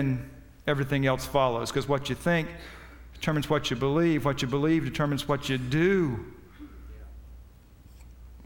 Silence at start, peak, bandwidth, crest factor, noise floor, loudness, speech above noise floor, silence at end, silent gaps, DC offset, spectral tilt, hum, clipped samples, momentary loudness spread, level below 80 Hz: 0 s; -10 dBFS; 18 kHz; 18 dB; -52 dBFS; -27 LUFS; 25 dB; 0 s; none; under 0.1%; -6 dB/octave; none; under 0.1%; 23 LU; -48 dBFS